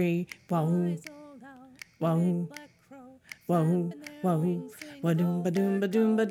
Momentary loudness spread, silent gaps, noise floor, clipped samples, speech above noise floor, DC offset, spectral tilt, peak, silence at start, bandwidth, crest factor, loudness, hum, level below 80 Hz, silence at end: 21 LU; none; -52 dBFS; under 0.1%; 24 dB; under 0.1%; -8 dB/octave; -16 dBFS; 0 s; 15 kHz; 14 dB; -29 LUFS; none; -74 dBFS; 0 s